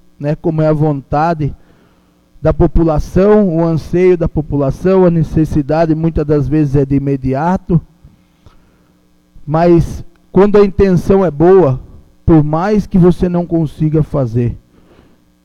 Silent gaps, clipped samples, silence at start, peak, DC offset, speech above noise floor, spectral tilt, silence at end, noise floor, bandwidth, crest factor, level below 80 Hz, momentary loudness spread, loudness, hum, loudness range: none; under 0.1%; 0.2 s; 0 dBFS; under 0.1%; 40 dB; -9.5 dB/octave; 0.85 s; -51 dBFS; 7.2 kHz; 12 dB; -26 dBFS; 8 LU; -12 LUFS; none; 5 LU